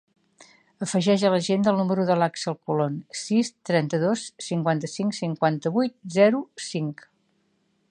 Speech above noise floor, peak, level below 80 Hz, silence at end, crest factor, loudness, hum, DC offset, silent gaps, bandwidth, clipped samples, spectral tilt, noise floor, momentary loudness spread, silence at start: 45 dB; -6 dBFS; -74 dBFS; 1 s; 18 dB; -24 LUFS; none; under 0.1%; none; 10.5 kHz; under 0.1%; -5.5 dB/octave; -69 dBFS; 9 LU; 0.4 s